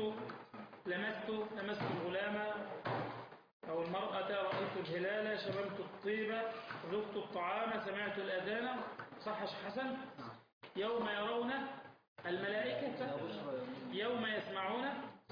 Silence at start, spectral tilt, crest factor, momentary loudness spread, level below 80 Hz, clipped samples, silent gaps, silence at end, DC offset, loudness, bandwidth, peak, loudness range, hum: 0 s; -3 dB/octave; 12 dB; 10 LU; -80 dBFS; under 0.1%; 3.53-3.60 s, 10.53-10.61 s, 12.08-12.16 s; 0 s; under 0.1%; -41 LUFS; 5.2 kHz; -28 dBFS; 2 LU; none